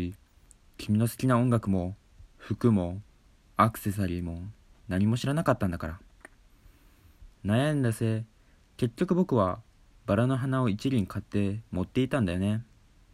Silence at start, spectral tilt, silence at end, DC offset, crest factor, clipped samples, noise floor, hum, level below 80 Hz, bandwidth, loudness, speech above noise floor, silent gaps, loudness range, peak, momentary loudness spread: 0 s; -7.5 dB/octave; 0.5 s; under 0.1%; 22 dB; under 0.1%; -59 dBFS; none; -52 dBFS; 14.5 kHz; -29 LUFS; 32 dB; none; 3 LU; -8 dBFS; 13 LU